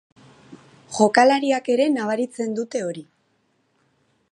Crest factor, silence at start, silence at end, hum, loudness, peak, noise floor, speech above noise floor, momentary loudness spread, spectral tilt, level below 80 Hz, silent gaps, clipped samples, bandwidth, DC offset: 22 dB; 0.5 s; 1.3 s; none; -20 LUFS; 0 dBFS; -67 dBFS; 47 dB; 15 LU; -4 dB/octave; -72 dBFS; none; under 0.1%; 11.5 kHz; under 0.1%